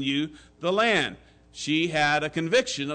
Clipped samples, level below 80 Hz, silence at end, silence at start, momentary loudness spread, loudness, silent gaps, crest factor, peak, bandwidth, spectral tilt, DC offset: under 0.1%; -60 dBFS; 0 s; 0 s; 10 LU; -25 LUFS; none; 14 dB; -12 dBFS; 9.4 kHz; -4 dB/octave; under 0.1%